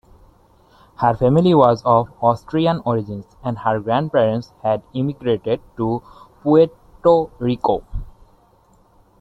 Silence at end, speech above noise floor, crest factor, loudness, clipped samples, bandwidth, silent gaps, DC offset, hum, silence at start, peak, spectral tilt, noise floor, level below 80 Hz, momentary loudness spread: 1.1 s; 37 dB; 20 dB; -19 LUFS; under 0.1%; 7.8 kHz; none; under 0.1%; none; 1 s; 0 dBFS; -8.5 dB/octave; -54 dBFS; -42 dBFS; 11 LU